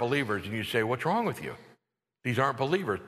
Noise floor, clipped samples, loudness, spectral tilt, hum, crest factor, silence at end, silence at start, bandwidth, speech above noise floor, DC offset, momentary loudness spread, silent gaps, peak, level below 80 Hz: -77 dBFS; under 0.1%; -30 LUFS; -6 dB/octave; none; 20 dB; 0 s; 0 s; 13.5 kHz; 47 dB; under 0.1%; 11 LU; none; -10 dBFS; -66 dBFS